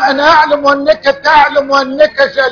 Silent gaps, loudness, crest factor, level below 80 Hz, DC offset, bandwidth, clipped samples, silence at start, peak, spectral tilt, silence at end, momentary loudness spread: none; -9 LUFS; 10 dB; -42 dBFS; under 0.1%; 5.4 kHz; 0.7%; 0 s; 0 dBFS; -3.5 dB/octave; 0 s; 4 LU